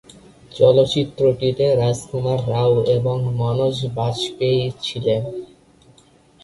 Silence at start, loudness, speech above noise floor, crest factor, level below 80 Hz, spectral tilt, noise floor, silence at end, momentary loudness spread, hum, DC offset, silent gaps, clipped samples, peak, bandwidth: 0.5 s; -19 LUFS; 34 dB; 18 dB; -50 dBFS; -6.5 dB/octave; -52 dBFS; 1 s; 8 LU; none; under 0.1%; none; under 0.1%; -2 dBFS; 11.5 kHz